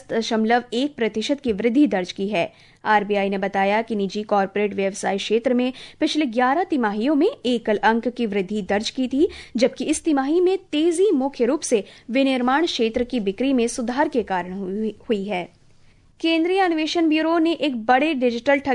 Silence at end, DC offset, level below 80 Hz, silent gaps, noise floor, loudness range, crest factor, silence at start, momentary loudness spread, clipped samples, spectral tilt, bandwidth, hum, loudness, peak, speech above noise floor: 0 s; under 0.1%; -54 dBFS; none; -52 dBFS; 2 LU; 16 dB; 0.1 s; 6 LU; under 0.1%; -4.5 dB/octave; 11 kHz; none; -21 LUFS; -6 dBFS; 31 dB